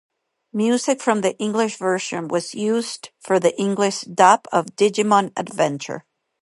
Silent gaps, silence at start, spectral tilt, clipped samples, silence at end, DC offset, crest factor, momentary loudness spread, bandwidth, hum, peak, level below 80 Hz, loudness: none; 0.55 s; -4 dB/octave; under 0.1%; 0.45 s; under 0.1%; 20 dB; 12 LU; 11.5 kHz; none; 0 dBFS; -72 dBFS; -20 LUFS